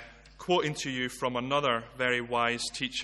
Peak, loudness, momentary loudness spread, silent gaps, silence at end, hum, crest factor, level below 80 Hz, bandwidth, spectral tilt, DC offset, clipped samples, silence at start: -12 dBFS; -30 LUFS; 4 LU; none; 0 s; none; 20 dB; -58 dBFS; 12.5 kHz; -3.5 dB/octave; under 0.1%; under 0.1%; 0 s